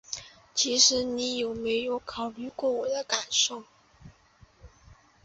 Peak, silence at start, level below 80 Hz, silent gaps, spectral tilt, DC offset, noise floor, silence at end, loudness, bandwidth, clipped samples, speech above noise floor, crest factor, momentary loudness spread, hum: -8 dBFS; 0.1 s; -60 dBFS; none; -0.5 dB/octave; under 0.1%; -59 dBFS; 0.3 s; -26 LUFS; 8.2 kHz; under 0.1%; 31 dB; 22 dB; 15 LU; none